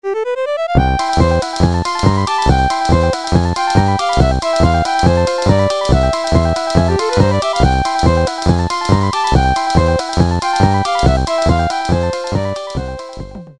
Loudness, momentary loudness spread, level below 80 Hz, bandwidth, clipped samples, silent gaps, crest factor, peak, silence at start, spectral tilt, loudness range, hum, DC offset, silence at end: -14 LUFS; 5 LU; -22 dBFS; 11.5 kHz; under 0.1%; none; 14 dB; 0 dBFS; 0.05 s; -6 dB/octave; 1 LU; none; 0.9%; 0.05 s